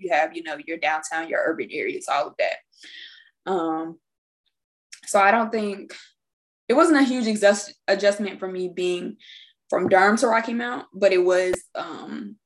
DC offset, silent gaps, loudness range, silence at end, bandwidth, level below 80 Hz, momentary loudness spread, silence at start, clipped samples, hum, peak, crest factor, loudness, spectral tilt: under 0.1%; 4.18-4.44 s, 4.64-4.90 s, 6.33-6.67 s; 6 LU; 0.1 s; 12.5 kHz; -70 dBFS; 18 LU; 0 s; under 0.1%; none; -4 dBFS; 20 dB; -22 LUFS; -4 dB/octave